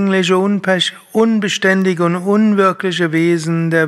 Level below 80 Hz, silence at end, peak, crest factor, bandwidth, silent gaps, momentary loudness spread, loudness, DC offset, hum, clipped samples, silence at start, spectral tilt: -66 dBFS; 0 s; 0 dBFS; 14 dB; 13 kHz; none; 3 LU; -14 LUFS; under 0.1%; none; under 0.1%; 0 s; -5.5 dB/octave